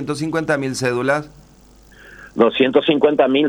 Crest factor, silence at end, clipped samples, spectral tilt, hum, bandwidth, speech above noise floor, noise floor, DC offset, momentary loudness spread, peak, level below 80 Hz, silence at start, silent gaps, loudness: 18 dB; 0 s; under 0.1%; -5 dB/octave; none; 19.5 kHz; 30 dB; -47 dBFS; under 0.1%; 7 LU; 0 dBFS; -52 dBFS; 0 s; none; -17 LUFS